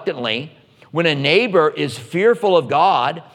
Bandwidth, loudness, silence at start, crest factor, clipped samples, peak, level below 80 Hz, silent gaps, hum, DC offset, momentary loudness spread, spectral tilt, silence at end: 13 kHz; -17 LUFS; 0 s; 16 dB; under 0.1%; 0 dBFS; -68 dBFS; none; none; under 0.1%; 10 LU; -5.5 dB/octave; 0.15 s